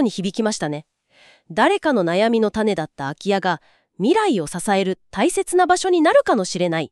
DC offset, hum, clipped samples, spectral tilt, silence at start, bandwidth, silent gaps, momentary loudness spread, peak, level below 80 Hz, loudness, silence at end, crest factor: under 0.1%; none; under 0.1%; -4.5 dB/octave; 0 s; 13 kHz; none; 9 LU; -4 dBFS; -54 dBFS; -19 LUFS; 0.05 s; 16 dB